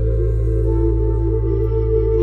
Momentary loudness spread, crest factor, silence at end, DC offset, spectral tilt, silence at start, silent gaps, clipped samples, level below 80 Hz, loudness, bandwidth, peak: 1 LU; 10 dB; 0 s; under 0.1%; -12 dB/octave; 0 s; none; under 0.1%; -20 dBFS; -19 LUFS; 2.4 kHz; -6 dBFS